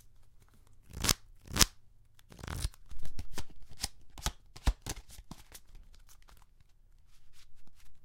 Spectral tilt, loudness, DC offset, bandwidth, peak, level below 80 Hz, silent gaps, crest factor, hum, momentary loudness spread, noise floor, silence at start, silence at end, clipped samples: -2 dB/octave; -35 LUFS; under 0.1%; 17 kHz; 0 dBFS; -44 dBFS; none; 36 dB; none; 25 LU; -59 dBFS; 0.05 s; 0 s; under 0.1%